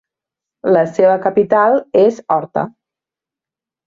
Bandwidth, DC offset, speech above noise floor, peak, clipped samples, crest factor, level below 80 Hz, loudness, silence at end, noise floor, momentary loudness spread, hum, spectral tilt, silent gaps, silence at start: 7.4 kHz; under 0.1%; 75 dB; -2 dBFS; under 0.1%; 14 dB; -60 dBFS; -14 LUFS; 1.15 s; -88 dBFS; 10 LU; none; -7.5 dB/octave; none; 0.65 s